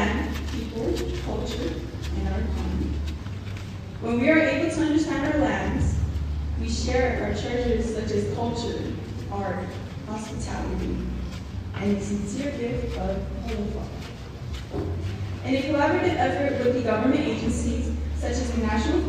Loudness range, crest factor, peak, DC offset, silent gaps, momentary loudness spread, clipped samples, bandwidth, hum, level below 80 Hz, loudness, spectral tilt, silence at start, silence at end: 6 LU; 20 dB; -6 dBFS; under 0.1%; none; 11 LU; under 0.1%; 14.5 kHz; none; -32 dBFS; -27 LUFS; -6 dB/octave; 0 s; 0 s